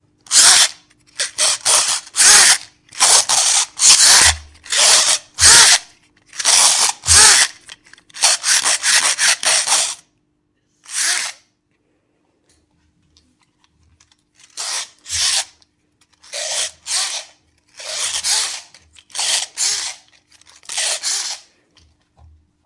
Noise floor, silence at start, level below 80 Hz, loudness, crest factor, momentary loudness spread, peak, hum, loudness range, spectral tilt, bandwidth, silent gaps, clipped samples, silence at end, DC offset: -66 dBFS; 0.3 s; -48 dBFS; -12 LUFS; 16 dB; 19 LU; 0 dBFS; none; 14 LU; 2 dB/octave; 12 kHz; none; 0.1%; 1.3 s; under 0.1%